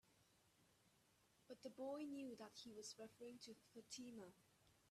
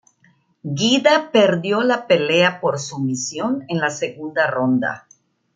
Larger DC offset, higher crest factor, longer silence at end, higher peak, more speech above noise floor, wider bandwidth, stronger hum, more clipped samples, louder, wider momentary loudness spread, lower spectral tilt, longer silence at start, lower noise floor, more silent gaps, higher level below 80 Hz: neither; about the same, 18 dB vs 18 dB; second, 0.05 s vs 0.55 s; second, -42 dBFS vs -2 dBFS; second, 23 dB vs 40 dB; first, 14 kHz vs 9.4 kHz; neither; neither; second, -57 LUFS vs -19 LUFS; about the same, 10 LU vs 10 LU; about the same, -3.5 dB/octave vs -4.5 dB/octave; second, 0.05 s vs 0.65 s; first, -79 dBFS vs -59 dBFS; neither; second, under -90 dBFS vs -66 dBFS